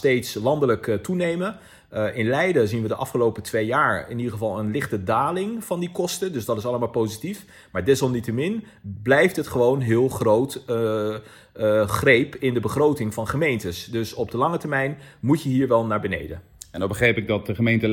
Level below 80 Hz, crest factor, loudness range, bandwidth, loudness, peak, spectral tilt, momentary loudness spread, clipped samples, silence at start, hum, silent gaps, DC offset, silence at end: -54 dBFS; 20 dB; 4 LU; 17.5 kHz; -23 LUFS; -4 dBFS; -6 dB/octave; 9 LU; under 0.1%; 0 s; none; none; under 0.1%; 0 s